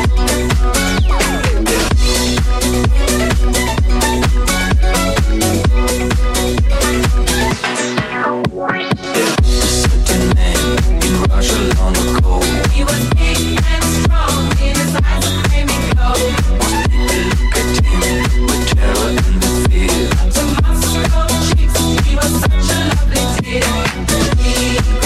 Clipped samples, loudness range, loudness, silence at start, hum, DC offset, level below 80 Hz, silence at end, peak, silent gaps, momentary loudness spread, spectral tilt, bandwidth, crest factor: under 0.1%; 1 LU; -14 LUFS; 0 s; none; under 0.1%; -16 dBFS; 0 s; 0 dBFS; none; 2 LU; -4.5 dB/octave; 15 kHz; 12 dB